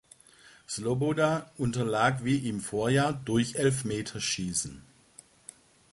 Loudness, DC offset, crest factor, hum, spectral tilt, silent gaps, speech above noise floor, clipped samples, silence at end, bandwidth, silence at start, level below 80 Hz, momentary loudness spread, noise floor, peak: -29 LUFS; under 0.1%; 20 dB; none; -5 dB/octave; none; 28 dB; under 0.1%; 1.15 s; 11.5 kHz; 0.7 s; -58 dBFS; 12 LU; -57 dBFS; -10 dBFS